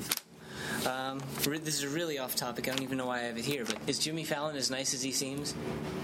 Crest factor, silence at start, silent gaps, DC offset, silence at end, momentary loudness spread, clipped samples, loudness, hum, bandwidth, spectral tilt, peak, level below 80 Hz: 26 dB; 0 s; none; under 0.1%; 0 s; 6 LU; under 0.1%; -34 LUFS; none; 16.5 kHz; -3 dB/octave; -8 dBFS; -64 dBFS